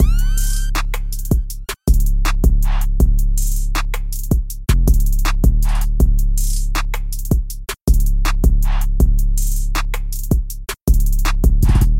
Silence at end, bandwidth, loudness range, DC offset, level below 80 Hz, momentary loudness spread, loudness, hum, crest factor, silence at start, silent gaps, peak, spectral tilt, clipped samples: 0 s; 16.5 kHz; 1 LU; under 0.1%; -14 dBFS; 7 LU; -19 LUFS; none; 12 dB; 0 s; 7.81-7.85 s, 10.81-10.85 s; -2 dBFS; -5 dB/octave; under 0.1%